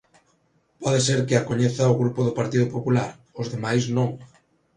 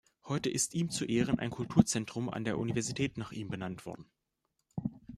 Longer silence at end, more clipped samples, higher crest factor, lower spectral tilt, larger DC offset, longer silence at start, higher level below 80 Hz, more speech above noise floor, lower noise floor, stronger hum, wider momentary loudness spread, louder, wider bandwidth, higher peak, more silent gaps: first, 0.5 s vs 0 s; neither; second, 18 dB vs 26 dB; about the same, -5.5 dB/octave vs -5 dB/octave; neither; first, 0.8 s vs 0.25 s; about the same, -56 dBFS vs -60 dBFS; second, 43 dB vs 49 dB; second, -65 dBFS vs -82 dBFS; neither; about the same, 10 LU vs 12 LU; first, -23 LUFS vs -34 LUFS; second, 10.5 kHz vs 14 kHz; first, -4 dBFS vs -8 dBFS; neither